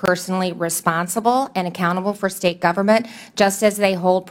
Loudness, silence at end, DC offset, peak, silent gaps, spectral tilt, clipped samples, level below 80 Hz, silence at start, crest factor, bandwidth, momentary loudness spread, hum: -19 LUFS; 0 s; under 0.1%; 0 dBFS; none; -4.5 dB/octave; under 0.1%; -62 dBFS; 0 s; 18 dB; 16.5 kHz; 5 LU; none